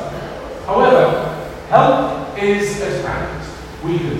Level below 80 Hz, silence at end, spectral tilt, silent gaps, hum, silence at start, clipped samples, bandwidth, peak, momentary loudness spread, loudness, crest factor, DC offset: -38 dBFS; 0 s; -6 dB/octave; none; none; 0 s; under 0.1%; 16 kHz; 0 dBFS; 16 LU; -16 LUFS; 16 dB; under 0.1%